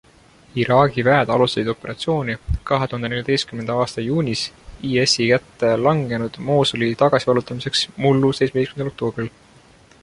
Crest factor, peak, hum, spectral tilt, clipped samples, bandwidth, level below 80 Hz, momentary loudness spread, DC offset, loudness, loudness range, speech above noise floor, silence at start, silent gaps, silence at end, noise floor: 18 dB; -2 dBFS; none; -5 dB/octave; under 0.1%; 11.5 kHz; -40 dBFS; 9 LU; under 0.1%; -19 LUFS; 3 LU; 31 dB; 0.55 s; none; 0.75 s; -50 dBFS